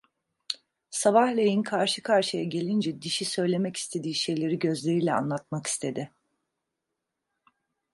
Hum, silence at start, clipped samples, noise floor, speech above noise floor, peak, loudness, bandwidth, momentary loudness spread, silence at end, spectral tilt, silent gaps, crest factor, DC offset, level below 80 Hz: none; 0.5 s; under 0.1%; -84 dBFS; 58 dB; -8 dBFS; -27 LUFS; 11.5 kHz; 12 LU; 1.85 s; -4.5 dB/octave; none; 20 dB; under 0.1%; -74 dBFS